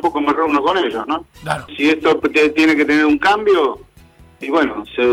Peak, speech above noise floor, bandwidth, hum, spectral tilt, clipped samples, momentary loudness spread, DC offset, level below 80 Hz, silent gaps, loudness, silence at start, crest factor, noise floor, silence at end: -4 dBFS; 30 dB; 12.5 kHz; none; -5 dB/octave; under 0.1%; 11 LU; under 0.1%; -48 dBFS; none; -16 LUFS; 0.05 s; 12 dB; -46 dBFS; 0 s